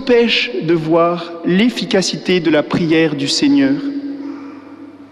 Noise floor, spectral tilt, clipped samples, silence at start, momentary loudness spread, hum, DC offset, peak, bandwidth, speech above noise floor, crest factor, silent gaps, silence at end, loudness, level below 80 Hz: -36 dBFS; -5 dB/octave; under 0.1%; 0 s; 14 LU; none; under 0.1%; -2 dBFS; 12 kHz; 21 dB; 12 dB; none; 0.05 s; -15 LUFS; -52 dBFS